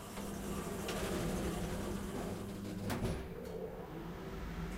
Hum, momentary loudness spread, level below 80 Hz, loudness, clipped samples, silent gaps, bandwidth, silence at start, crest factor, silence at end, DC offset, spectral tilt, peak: none; 7 LU; -50 dBFS; -42 LUFS; under 0.1%; none; 16 kHz; 0 s; 14 dB; 0 s; under 0.1%; -5.5 dB/octave; -26 dBFS